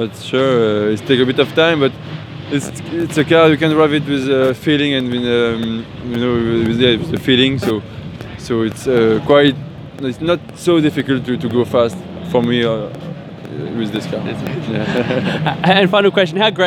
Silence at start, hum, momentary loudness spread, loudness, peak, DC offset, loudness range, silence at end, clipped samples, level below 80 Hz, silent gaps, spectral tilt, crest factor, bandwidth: 0 s; none; 13 LU; -15 LUFS; 0 dBFS; under 0.1%; 4 LU; 0 s; under 0.1%; -46 dBFS; none; -6 dB/octave; 16 dB; 16.5 kHz